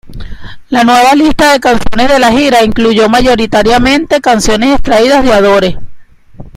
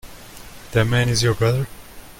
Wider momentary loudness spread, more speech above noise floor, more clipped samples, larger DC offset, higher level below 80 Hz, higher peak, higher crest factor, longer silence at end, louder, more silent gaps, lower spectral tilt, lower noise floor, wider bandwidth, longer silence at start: second, 4 LU vs 22 LU; about the same, 24 dB vs 21 dB; first, 0.5% vs under 0.1%; neither; first, -24 dBFS vs -40 dBFS; first, 0 dBFS vs -6 dBFS; second, 8 dB vs 16 dB; about the same, 0.05 s vs 0.1 s; first, -7 LUFS vs -20 LUFS; neither; about the same, -4 dB/octave vs -5 dB/octave; second, -30 dBFS vs -39 dBFS; about the same, 16 kHz vs 17 kHz; about the same, 0.05 s vs 0.05 s